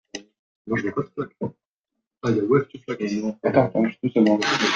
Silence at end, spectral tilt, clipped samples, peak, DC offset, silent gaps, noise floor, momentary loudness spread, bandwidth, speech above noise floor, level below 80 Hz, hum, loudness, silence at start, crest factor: 0 s; -5.5 dB/octave; under 0.1%; -4 dBFS; under 0.1%; 0.39-0.65 s, 1.67-1.84 s, 2.07-2.11 s; -83 dBFS; 13 LU; 9.2 kHz; 61 dB; -62 dBFS; none; -23 LUFS; 0.15 s; 20 dB